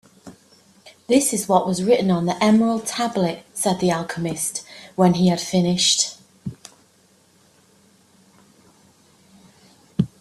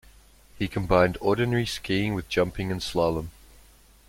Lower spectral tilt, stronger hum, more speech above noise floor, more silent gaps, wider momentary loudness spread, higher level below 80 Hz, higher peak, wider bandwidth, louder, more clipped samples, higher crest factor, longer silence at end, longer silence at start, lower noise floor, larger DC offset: second, -4.5 dB/octave vs -6 dB/octave; neither; first, 38 dB vs 29 dB; neither; first, 15 LU vs 9 LU; second, -58 dBFS vs -46 dBFS; first, -2 dBFS vs -6 dBFS; second, 13.5 kHz vs 16.5 kHz; first, -20 LUFS vs -26 LUFS; neither; about the same, 20 dB vs 20 dB; second, 0.15 s vs 0.8 s; second, 0.25 s vs 0.55 s; about the same, -57 dBFS vs -54 dBFS; neither